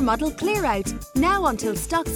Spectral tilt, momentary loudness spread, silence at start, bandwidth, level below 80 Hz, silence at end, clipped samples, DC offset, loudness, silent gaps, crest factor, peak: -4.5 dB/octave; 6 LU; 0 s; over 20 kHz; -36 dBFS; 0 s; under 0.1%; under 0.1%; -23 LUFS; none; 16 dB; -8 dBFS